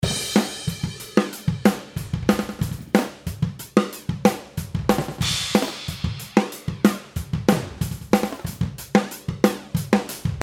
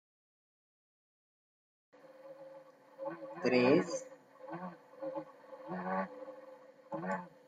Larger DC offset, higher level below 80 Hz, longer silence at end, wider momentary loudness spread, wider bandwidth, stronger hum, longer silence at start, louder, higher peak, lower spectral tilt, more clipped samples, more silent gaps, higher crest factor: neither; first, -42 dBFS vs -84 dBFS; second, 0 s vs 0.2 s; second, 8 LU vs 25 LU; first, 17 kHz vs 9.4 kHz; neither; second, 0 s vs 2.05 s; first, -24 LUFS vs -36 LUFS; first, -2 dBFS vs -16 dBFS; about the same, -5 dB/octave vs -5.5 dB/octave; neither; neither; about the same, 22 dB vs 24 dB